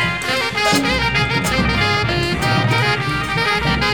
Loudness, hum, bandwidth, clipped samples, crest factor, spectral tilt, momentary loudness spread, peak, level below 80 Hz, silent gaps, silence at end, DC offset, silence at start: -16 LUFS; none; over 20 kHz; under 0.1%; 14 dB; -4.5 dB/octave; 3 LU; -4 dBFS; -32 dBFS; none; 0 s; 0.6%; 0 s